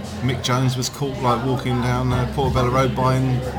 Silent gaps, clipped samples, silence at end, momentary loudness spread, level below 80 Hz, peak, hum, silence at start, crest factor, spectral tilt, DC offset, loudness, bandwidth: none; under 0.1%; 0 s; 4 LU; -34 dBFS; -6 dBFS; none; 0 s; 14 dB; -6 dB/octave; under 0.1%; -20 LUFS; 17.5 kHz